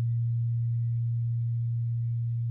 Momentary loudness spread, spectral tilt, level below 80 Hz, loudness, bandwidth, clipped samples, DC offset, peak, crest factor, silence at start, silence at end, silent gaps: 2 LU; -12.5 dB/octave; -62 dBFS; -30 LUFS; 0.2 kHz; under 0.1%; under 0.1%; -24 dBFS; 4 dB; 0 s; 0 s; none